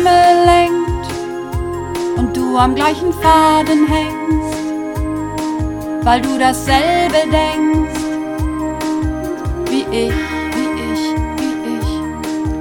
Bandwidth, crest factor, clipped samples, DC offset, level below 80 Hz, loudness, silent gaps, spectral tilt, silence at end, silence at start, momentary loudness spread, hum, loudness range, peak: 18 kHz; 14 dB; under 0.1%; under 0.1%; -28 dBFS; -16 LUFS; none; -5.5 dB/octave; 0 s; 0 s; 11 LU; none; 5 LU; 0 dBFS